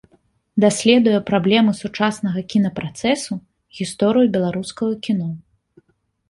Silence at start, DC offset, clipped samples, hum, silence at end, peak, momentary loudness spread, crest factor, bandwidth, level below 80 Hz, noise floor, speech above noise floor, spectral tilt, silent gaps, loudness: 0.55 s; under 0.1%; under 0.1%; none; 0.9 s; -2 dBFS; 14 LU; 18 dB; 11.5 kHz; -56 dBFS; -64 dBFS; 46 dB; -5.5 dB/octave; none; -19 LUFS